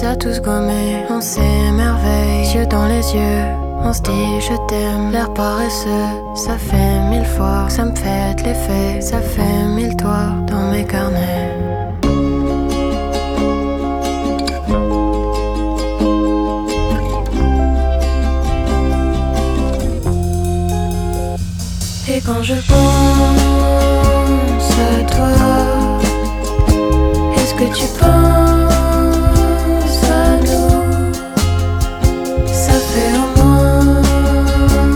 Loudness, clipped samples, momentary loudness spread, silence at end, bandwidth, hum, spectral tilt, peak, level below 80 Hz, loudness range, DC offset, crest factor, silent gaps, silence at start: -15 LUFS; under 0.1%; 7 LU; 0 s; 17.5 kHz; none; -6 dB/octave; 0 dBFS; -18 dBFS; 5 LU; under 0.1%; 14 dB; none; 0 s